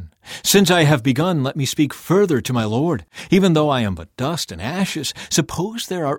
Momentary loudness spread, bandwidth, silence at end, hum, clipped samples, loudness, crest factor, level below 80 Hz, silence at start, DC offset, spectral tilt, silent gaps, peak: 10 LU; 17.5 kHz; 0 s; none; under 0.1%; -19 LUFS; 16 dB; -48 dBFS; 0 s; under 0.1%; -5 dB/octave; none; -2 dBFS